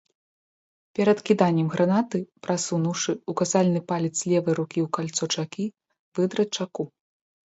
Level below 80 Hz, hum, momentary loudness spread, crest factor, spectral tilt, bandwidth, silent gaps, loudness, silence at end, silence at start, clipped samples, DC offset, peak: -70 dBFS; none; 11 LU; 20 dB; -5 dB/octave; 8.2 kHz; 5.99-6.12 s; -25 LUFS; 0.6 s; 1 s; under 0.1%; under 0.1%; -6 dBFS